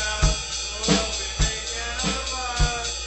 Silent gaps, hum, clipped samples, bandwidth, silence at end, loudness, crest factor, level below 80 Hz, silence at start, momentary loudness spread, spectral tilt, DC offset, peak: none; none; under 0.1%; 8.4 kHz; 0 s; -24 LUFS; 20 dB; -30 dBFS; 0 s; 5 LU; -2.5 dB/octave; under 0.1%; -6 dBFS